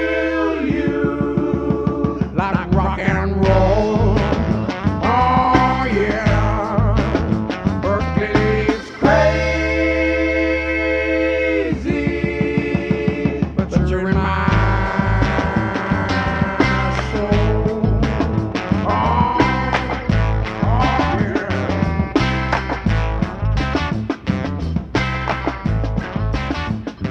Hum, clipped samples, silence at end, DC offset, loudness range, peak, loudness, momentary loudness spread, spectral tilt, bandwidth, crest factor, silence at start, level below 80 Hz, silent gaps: none; under 0.1%; 0 s; under 0.1%; 3 LU; 0 dBFS; -18 LUFS; 5 LU; -7.5 dB/octave; 8.2 kHz; 18 dB; 0 s; -26 dBFS; none